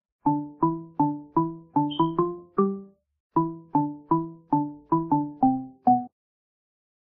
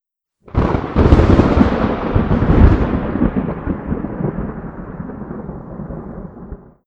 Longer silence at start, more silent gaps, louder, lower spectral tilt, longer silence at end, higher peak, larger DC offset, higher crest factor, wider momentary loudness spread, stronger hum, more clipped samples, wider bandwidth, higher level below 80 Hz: second, 0.25 s vs 0.45 s; first, 3.20-3.30 s vs none; second, -26 LUFS vs -16 LUFS; second, -8 dB/octave vs -9.5 dB/octave; first, 1.1 s vs 0.3 s; second, -8 dBFS vs 0 dBFS; neither; about the same, 18 dB vs 16 dB; second, 4 LU vs 18 LU; neither; neither; second, 3.8 kHz vs 7.2 kHz; second, -60 dBFS vs -22 dBFS